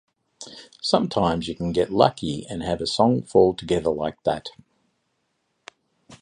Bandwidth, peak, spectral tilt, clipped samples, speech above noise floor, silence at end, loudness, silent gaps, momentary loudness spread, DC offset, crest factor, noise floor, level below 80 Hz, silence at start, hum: 11 kHz; 0 dBFS; -6 dB/octave; under 0.1%; 51 dB; 0.05 s; -23 LUFS; none; 18 LU; under 0.1%; 24 dB; -73 dBFS; -50 dBFS; 0.4 s; none